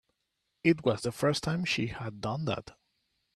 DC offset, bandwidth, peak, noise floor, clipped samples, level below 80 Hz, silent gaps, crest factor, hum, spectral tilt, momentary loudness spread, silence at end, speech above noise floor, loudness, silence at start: under 0.1%; 13.5 kHz; -10 dBFS; -81 dBFS; under 0.1%; -60 dBFS; none; 22 dB; none; -5.5 dB/octave; 9 LU; 0.65 s; 51 dB; -31 LUFS; 0.65 s